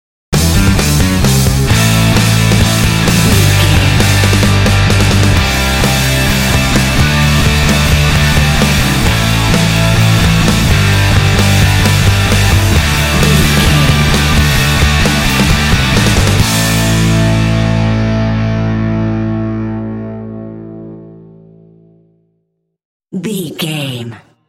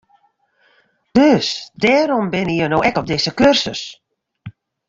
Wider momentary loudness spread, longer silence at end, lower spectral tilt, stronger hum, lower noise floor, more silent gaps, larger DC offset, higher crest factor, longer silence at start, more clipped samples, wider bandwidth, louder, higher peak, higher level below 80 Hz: about the same, 10 LU vs 9 LU; about the same, 0.3 s vs 0.4 s; about the same, -4.5 dB/octave vs -5 dB/octave; neither; first, -65 dBFS vs -60 dBFS; first, 22.85-23.00 s vs none; neither; second, 10 dB vs 16 dB; second, 0.3 s vs 1.15 s; neither; first, 17 kHz vs 7.8 kHz; first, -10 LUFS vs -16 LUFS; about the same, 0 dBFS vs -2 dBFS; first, -18 dBFS vs -48 dBFS